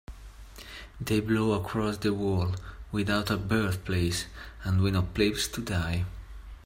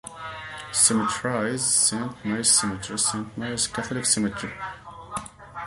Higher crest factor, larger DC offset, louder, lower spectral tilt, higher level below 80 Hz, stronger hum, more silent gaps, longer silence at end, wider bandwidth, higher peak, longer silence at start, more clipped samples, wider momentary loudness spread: about the same, 18 dB vs 22 dB; neither; second, -29 LUFS vs -22 LUFS; first, -5.5 dB/octave vs -2 dB/octave; first, -44 dBFS vs -54 dBFS; neither; neither; about the same, 0.05 s vs 0 s; first, 16 kHz vs 12 kHz; second, -10 dBFS vs -4 dBFS; about the same, 0.1 s vs 0.05 s; neither; about the same, 17 LU vs 17 LU